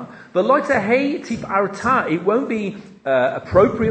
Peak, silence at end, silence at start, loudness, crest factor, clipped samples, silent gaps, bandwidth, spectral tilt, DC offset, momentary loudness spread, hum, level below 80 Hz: 0 dBFS; 0 s; 0 s; -19 LUFS; 18 dB; under 0.1%; none; 8.8 kHz; -6.5 dB/octave; under 0.1%; 9 LU; none; -48 dBFS